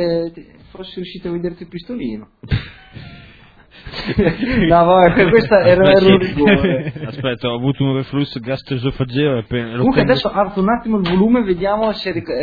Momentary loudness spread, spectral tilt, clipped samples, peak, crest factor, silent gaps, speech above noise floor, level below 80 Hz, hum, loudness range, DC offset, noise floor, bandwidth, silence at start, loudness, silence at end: 17 LU; -9 dB/octave; under 0.1%; 0 dBFS; 16 dB; none; 29 dB; -36 dBFS; none; 14 LU; under 0.1%; -44 dBFS; 5 kHz; 0 s; -15 LUFS; 0 s